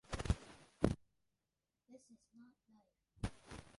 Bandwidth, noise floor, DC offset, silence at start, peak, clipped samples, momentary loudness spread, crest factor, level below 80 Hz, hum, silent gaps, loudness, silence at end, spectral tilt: 11.5 kHz; under -90 dBFS; under 0.1%; 0.1 s; -16 dBFS; under 0.1%; 25 LU; 30 dB; -52 dBFS; none; none; -43 LUFS; 0.15 s; -6.5 dB/octave